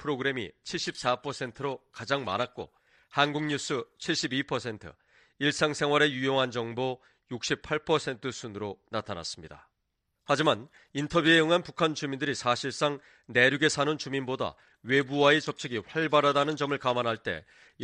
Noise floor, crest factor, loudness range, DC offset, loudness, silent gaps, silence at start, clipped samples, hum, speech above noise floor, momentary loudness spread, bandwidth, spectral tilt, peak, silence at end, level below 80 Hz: -80 dBFS; 22 dB; 6 LU; under 0.1%; -28 LUFS; none; 0 s; under 0.1%; none; 51 dB; 13 LU; 11 kHz; -4 dB/octave; -8 dBFS; 0 s; -64 dBFS